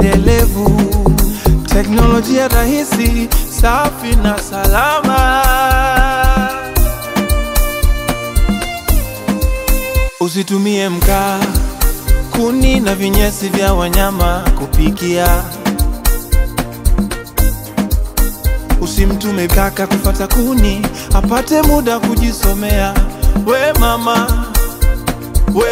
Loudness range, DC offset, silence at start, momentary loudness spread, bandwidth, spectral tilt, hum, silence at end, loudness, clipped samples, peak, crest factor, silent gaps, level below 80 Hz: 4 LU; under 0.1%; 0 s; 6 LU; 16.5 kHz; -5 dB/octave; none; 0 s; -14 LUFS; under 0.1%; 0 dBFS; 12 dB; none; -14 dBFS